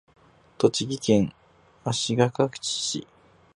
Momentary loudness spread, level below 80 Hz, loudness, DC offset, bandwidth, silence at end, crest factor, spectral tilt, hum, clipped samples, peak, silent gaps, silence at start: 8 LU; -58 dBFS; -25 LUFS; under 0.1%; 11.5 kHz; 0.5 s; 22 dB; -4.5 dB/octave; none; under 0.1%; -4 dBFS; none; 0.6 s